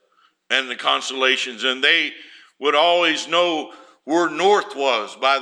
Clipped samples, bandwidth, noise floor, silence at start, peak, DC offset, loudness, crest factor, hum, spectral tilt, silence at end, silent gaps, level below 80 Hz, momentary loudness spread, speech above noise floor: under 0.1%; 11 kHz; -61 dBFS; 0.5 s; -2 dBFS; under 0.1%; -19 LUFS; 18 dB; none; -1.5 dB/octave; 0 s; none; -82 dBFS; 7 LU; 42 dB